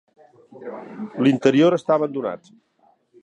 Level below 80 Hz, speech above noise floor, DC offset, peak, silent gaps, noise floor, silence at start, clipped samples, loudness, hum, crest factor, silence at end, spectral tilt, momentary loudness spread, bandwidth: -72 dBFS; 40 dB; under 0.1%; -4 dBFS; none; -60 dBFS; 0.55 s; under 0.1%; -19 LUFS; none; 18 dB; 0.85 s; -7 dB/octave; 20 LU; 8.4 kHz